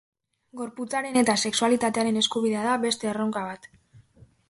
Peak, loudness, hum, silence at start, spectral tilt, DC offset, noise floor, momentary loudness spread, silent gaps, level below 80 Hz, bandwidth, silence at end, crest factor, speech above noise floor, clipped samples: -8 dBFS; -25 LUFS; none; 0.55 s; -3 dB/octave; under 0.1%; -56 dBFS; 14 LU; none; -66 dBFS; 11.5 kHz; 0.5 s; 18 dB; 31 dB; under 0.1%